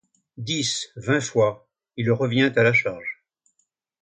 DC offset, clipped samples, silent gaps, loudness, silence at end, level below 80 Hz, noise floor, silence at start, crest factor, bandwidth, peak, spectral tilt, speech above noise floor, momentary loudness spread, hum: under 0.1%; under 0.1%; none; -22 LUFS; 0.9 s; -62 dBFS; -72 dBFS; 0.4 s; 18 dB; 9.6 kHz; -6 dBFS; -4.5 dB/octave; 50 dB; 18 LU; none